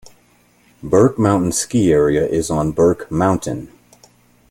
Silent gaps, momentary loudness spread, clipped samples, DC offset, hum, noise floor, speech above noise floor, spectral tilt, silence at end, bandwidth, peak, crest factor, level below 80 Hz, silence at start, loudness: none; 8 LU; under 0.1%; under 0.1%; 60 Hz at -40 dBFS; -54 dBFS; 39 dB; -6 dB/octave; 0.85 s; 17 kHz; -2 dBFS; 16 dB; -42 dBFS; 0.85 s; -16 LUFS